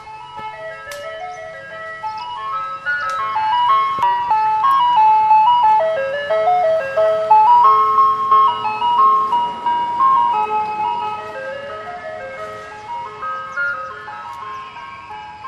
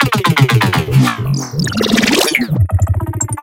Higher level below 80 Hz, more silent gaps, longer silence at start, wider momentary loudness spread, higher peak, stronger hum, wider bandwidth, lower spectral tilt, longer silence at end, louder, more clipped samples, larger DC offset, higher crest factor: second, -58 dBFS vs -30 dBFS; neither; about the same, 0 s vs 0 s; first, 18 LU vs 7 LU; about the same, -2 dBFS vs 0 dBFS; neither; second, 11.5 kHz vs 17.5 kHz; second, -3.5 dB/octave vs -5 dB/octave; about the same, 0 s vs 0 s; about the same, -15 LUFS vs -13 LUFS; neither; neither; about the same, 14 dB vs 14 dB